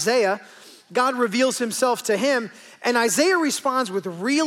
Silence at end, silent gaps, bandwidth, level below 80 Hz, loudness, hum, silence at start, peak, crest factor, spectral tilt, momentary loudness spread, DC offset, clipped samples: 0 s; none; 17 kHz; -78 dBFS; -22 LUFS; none; 0 s; -8 dBFS; 14 dB; -2.5 dB/octave; 8 LU; under 0.1%; under 0.1%